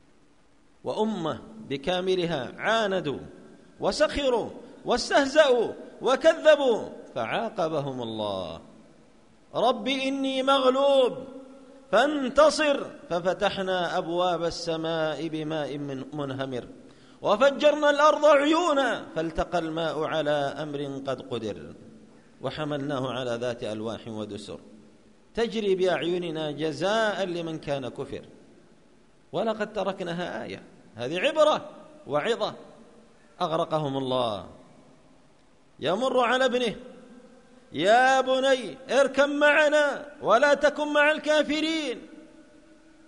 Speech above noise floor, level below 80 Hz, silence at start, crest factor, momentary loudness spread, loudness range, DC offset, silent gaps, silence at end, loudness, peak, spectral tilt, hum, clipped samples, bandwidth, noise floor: 37 dB; -56 dBFS; 0.85 s; 20 dB; 16 LU; 9 LU; 0.1%; none; 0.65 s; -25 LUFS; -6 dBFS; -4.5 dB/octave; none; under 0.1%; 10.5 kHz; -62 dBFS